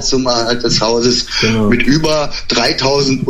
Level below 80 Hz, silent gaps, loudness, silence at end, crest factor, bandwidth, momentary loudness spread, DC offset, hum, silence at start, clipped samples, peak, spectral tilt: -28 dBFS; none; -13 LUFS; 0 s; 12 dB; 13.5 kHz; 2 LU; under 0.1%; none; 0 s; under 0.1%; 0 dBFS; -4 dB/octave